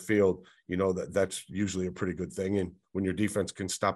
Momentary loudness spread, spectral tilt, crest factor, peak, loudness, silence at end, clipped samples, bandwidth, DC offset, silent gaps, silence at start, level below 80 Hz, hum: 6 LU; -5.5 dB/octave; 18 dB; -12 dBFS; -31 LUFS; 0 s; under 0.1%; 12.5 kHz; under 0.1%; none; 0 s; -60 dBFS; none